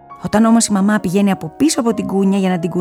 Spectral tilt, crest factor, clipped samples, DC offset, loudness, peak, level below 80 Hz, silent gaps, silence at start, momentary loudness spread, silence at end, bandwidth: -5.5 dB/octave; 12 dB; under 0.1%; under 0.1%; -15 LUFS; -2 dBFS; -50 dBFS; none; 0.1 s; 5 LU; 0 s; 15.5 kHz